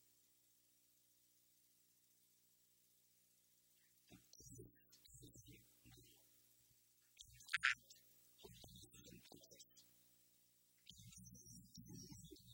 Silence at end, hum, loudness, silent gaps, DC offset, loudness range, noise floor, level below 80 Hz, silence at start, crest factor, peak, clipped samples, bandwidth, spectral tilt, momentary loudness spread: 0 s; 60 Hz at -80 dBFS; -49 LUFS; none; under 0.1%; 17 LU; -77 dBFS; -80 dBFS; 0 s; 36 dB; -22 dBFS; under 0.1%; 16.5 kHz; -1.5 dB/octave; 23 LU